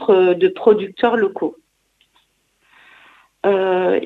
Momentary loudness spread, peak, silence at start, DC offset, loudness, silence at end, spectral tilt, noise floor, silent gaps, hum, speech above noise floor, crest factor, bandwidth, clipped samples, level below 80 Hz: 8 LU; -2 dBFS; 0 s; under 0.1%; -17 LUFS; 0 s; -7.5 dB/octave; -63 dBFS; none; none; 47 dB; 16 dB; 4.4 kHz; under 0.1%; -64 dBFS